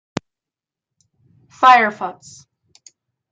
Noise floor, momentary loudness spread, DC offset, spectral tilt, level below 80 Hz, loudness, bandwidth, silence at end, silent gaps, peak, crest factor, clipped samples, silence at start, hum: -88 dBFS; 20 LU; under 0.1%; -3.5 dB/octave; -64 dBFS; -13 LUFS; 9 kHz; 1.2 s; none; -2 dBFS; 20 dB; under 0.1%; 1.6 s; none